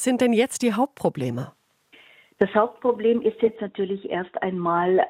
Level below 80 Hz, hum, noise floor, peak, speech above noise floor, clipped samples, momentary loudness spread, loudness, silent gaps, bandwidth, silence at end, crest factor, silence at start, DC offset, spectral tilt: -66 dBFS; none; -55 dBFS; -4 dBFS; 33 dB; under 0.1%; 9 LU; -24 LUFS; none; 16 kHz; 0 s; 20 dB; 0 s; under 0.1%; -5.5 dB/octave